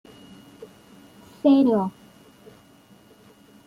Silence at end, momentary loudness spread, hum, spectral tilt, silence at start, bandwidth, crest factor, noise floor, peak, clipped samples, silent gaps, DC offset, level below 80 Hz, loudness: 1.75 s; 28 LU; none; -8 dB/octave; 0.6 s; 10.5 kHz; 18 dB; -53 dBFS; -8 dBFS; under 0.1%; none; under 0.1%; -68 dBFS; -20 LUFS